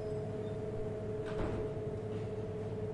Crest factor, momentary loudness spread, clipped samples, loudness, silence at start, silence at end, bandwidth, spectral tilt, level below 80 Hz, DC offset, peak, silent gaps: 14 dB; 2 LU; under 0.1%; -40 LUFS; 0 s; 0 s; 11 kHz; -8.5 dB/octave; -52 dBFS; under 0.1%; -24 dBFS; none